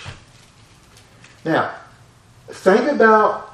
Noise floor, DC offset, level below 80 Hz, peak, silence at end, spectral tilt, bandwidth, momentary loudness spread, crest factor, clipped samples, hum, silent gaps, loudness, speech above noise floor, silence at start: -49 dBFS; under 0.1%; -56 dBFS; 0 dBFS; 0.05 s; -6 dB/octave; 12 kHz; 25 LU; 20 dB; under 0.1%; none; none; -16 LUFS; 33 dB; 0 s